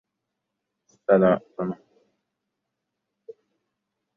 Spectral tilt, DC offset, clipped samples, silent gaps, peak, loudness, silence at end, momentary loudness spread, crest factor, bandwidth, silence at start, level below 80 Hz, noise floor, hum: -9.5 dB/octave; under 0.1%; under 0.1%; none; -6 dBFS; -23 LUFS; 2.4 s; 15 LU; 22 dB; 6.2 kHz; 1.1 s; -68 dBFS; -82 dBFS; none